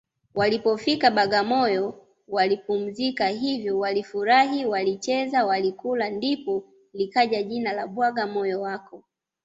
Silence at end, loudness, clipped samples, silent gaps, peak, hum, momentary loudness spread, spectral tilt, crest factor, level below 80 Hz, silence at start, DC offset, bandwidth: 0.45 s; -24 LUFS; under 0.1%; none; -6 dBFS; none; 10 LU; -4.5 dB/octave; 20 dB; -66 dBFS; 0.35 s; under 0.1%; 7.8 kHz